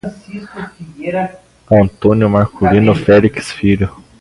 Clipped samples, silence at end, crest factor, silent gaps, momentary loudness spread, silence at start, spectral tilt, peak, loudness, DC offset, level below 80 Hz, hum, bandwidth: under 0.1%; 0.3 s; 14 dB; none; 19 LU; 0.05 s; -8 dB/octave; 0 dBFS; -13 LUFS; under 0.1%; -36 dBFS; none; 11.5 kHz